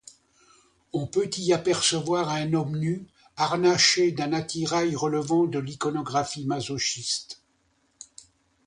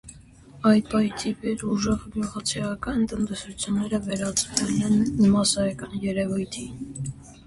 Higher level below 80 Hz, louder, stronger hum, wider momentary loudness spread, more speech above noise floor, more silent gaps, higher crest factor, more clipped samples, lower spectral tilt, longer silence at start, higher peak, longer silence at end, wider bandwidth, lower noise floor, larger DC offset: second, -62 dBFS vs -48 dBFS; about the same, -25 LUFS vs -25 LUFS; neither; about the same, 13 LU vs 12 LU; first, 43 dB vs 24 dB; neither; about the same, 20 dB vs 18 dB; neither; about the same, -4 dB/octave vs -4.5 dB/octave; first, 0.95 s vs 0.05 s; about the same, -6 dBFS vs -6 dBFS; first, 1.35 s vs 0.05 s; about the same, 11 kHz vs 11.5 kHz; first, -68 dBFS vs -48 dBFS; neither